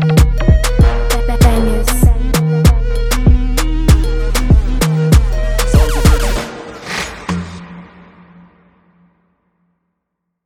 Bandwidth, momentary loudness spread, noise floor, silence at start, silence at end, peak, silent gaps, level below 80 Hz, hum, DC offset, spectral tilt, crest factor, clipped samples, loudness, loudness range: 17 kHz; 10 LU; -74 dBFS; 0 s; 2.6 s; 0 dBFS; none; -14 dBFS; none; under 0.1%; -5.5 dB/octave; 12 dB; under 0.1%; -14 LUFS; 14 LU